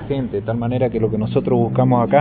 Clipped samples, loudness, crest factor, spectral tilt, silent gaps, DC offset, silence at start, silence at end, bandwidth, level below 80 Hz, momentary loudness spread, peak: under 0.1%; -19 LUFS; 16 dB; -13 dB/octave; none; under 0.1%; 0 s; 0 s; 4.4 kHz; -42 dBFS; 6 LU; -2 dBFS